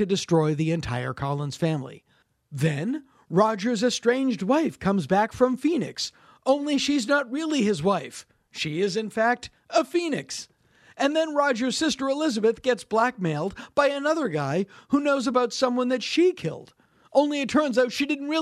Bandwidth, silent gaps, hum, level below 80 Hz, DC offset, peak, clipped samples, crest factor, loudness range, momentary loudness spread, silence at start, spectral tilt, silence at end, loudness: 13.5 kHz; none; none; -58 dBFS; under 0.1%; -6 dBFS; under 0.1%; 18 dB; 3 LU; 9 LU; 0 s; -5 dB/octave; 0 s; -25 LUFS